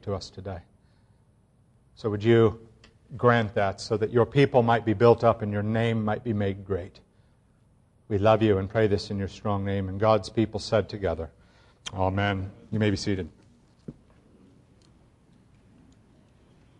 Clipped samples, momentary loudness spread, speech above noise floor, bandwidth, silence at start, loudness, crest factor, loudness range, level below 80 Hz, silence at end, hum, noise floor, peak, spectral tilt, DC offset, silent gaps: under 0.1%; 18 LU; 37 dB; 9.8 kHz; 0.05 s; -25 LUFS; 22 dB; 8 LU; -54 dBFS; 2.85 s; none; -62 dBFS; -4 dBFS; -7 dB/octave; under 0.1%; none